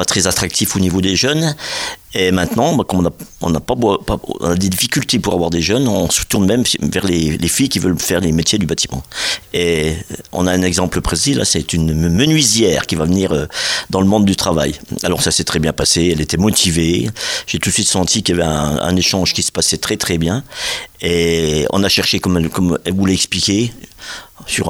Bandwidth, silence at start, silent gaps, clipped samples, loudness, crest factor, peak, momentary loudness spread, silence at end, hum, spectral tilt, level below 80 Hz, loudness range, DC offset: over 20 kHz; 0 s; none; under 0.1%; -15 LUFS; 16 dB; 0 dBFS; 7 LU; 0 s; none; -4 dB/octave; -34 dBFS; 2 LU; under 0.1%